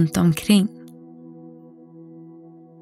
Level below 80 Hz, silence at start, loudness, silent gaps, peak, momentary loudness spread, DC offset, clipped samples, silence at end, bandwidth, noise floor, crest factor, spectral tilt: -56 dBFS; 0 s; -19 LUFS; none; -4 dBFS; 26 LU; under 0.1%; under 0.1%; 1.35 s; 16 kHz; -45 dBFS; 20 dB; -6 dB/octave